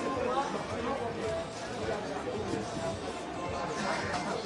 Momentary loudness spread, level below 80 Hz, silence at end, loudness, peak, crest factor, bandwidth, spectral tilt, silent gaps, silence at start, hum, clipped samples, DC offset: 5 LU; -56 dBFS; 0 s; -35 LUFS; -16 dBFS; 18 dB; 11.5 kHz; -4.5 dB/octave; none; 0 s; none; under 0.1%; under 0.1%